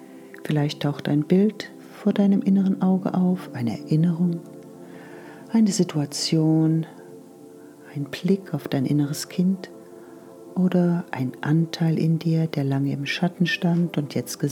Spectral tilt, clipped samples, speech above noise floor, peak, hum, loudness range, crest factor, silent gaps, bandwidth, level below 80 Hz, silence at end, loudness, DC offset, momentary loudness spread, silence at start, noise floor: -6.5 dB/octave; under 0.1%; 23 dB; -6 dBFS; none; 3 LU; 16 dB; none; 16 kHz; -74 dBFS; 0 s; -23 LUFS; under 0.1%; 21 LU; 0 s; -45 dBFS